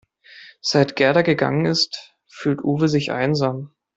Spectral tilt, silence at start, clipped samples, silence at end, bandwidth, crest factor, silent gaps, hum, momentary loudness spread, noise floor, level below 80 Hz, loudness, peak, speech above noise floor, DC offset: -5.5 dB/octave; 0.35 s; under 0.1%; 0.3 s; 8 kHz; 18 dB; none; none; 10 LU; -46 dBFS; -58 dBFS; -20 LUFS; -2 dBFS; 27 dB; under 0.1%